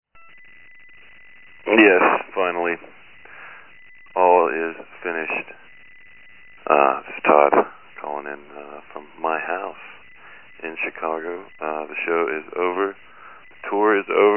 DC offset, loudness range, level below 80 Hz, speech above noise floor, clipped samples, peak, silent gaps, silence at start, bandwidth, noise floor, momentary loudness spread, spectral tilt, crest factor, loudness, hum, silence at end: 0.4%; 8 LU; -68 dBFS; 29 dB; under 0.1%; 0 dBFS; none; 1.65 s; 3.2 kHz; -49 dBFS; 23 LU; -8 dB/octave; 22 dB; -20 LUFS; none; 0 s